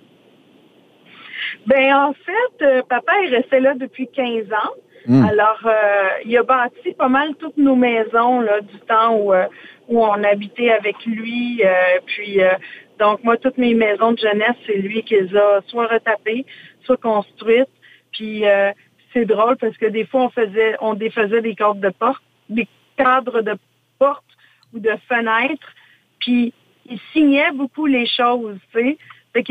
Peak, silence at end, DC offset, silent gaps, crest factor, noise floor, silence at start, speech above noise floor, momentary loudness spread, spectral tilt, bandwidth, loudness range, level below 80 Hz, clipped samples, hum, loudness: -2 dBFS; 0 s; under 0.1%; none; 14 dB; -51 dBFS; 1.2 s; 34 dB; 11 LU; -7.5 dB/octave; 4.9 kHz; 3 LU; -62 dBFS; under 0.1%; none; -17 LUFS